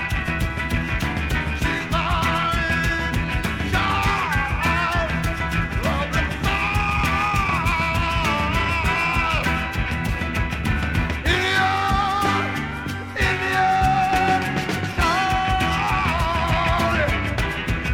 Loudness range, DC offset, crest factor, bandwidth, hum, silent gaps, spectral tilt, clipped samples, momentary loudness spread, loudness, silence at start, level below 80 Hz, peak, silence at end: 2 LU; under 0.1%; 16 dB; 18 kHz; none; none; -5 dB/octave; under 0.1%; 5 LU; -21 LUFS; 0 s; -30 dBFS; -6 dBFS; 0 s